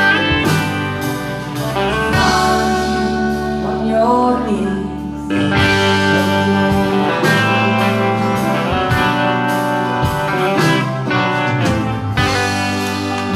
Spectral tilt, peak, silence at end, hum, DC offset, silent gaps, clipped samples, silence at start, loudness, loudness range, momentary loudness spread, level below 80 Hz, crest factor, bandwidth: -5.5 dB/octave; -2 dBFS; 0 s; none; under 0.1%; none; under 0.1%; 0 s; -15 LUFS; 2 LU; 6 LU; -36 dBFS; 12 dB; 15 kHz